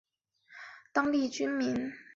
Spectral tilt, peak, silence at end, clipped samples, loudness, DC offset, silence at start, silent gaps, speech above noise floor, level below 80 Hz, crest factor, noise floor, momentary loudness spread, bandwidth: -4.5 dB/octave; -14 dBFS; 0.15 s; under 0.1%; -31 LUFS; under 0.1%; 0.5 s; none; 34 dB; -70 dBFS; 18 dB; -65 dBFS; 19 LU; 7.8 kHz